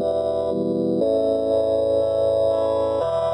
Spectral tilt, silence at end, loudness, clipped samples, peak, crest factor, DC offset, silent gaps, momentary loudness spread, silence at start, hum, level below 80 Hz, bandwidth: -7.5 dB/octave; 0 s; -21 LUFS; under 0.1%; -10 dBFS; 10 dB; under 0.1%; none; 3 LU; 0 s; none; -52 dBFS; 10 kHz